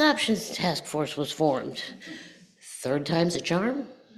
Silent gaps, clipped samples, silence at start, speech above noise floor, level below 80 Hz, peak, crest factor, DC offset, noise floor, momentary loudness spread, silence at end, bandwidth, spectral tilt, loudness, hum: none; under 0.1%; 0 s; 19 dB; -64 dBFS; -10 dBFS; 18 dB; under 0.1%; -47 dBFS; 14 LU; 0.25 s; 14.5 kHz; -4.5 dB/octave; -27 LUFS; none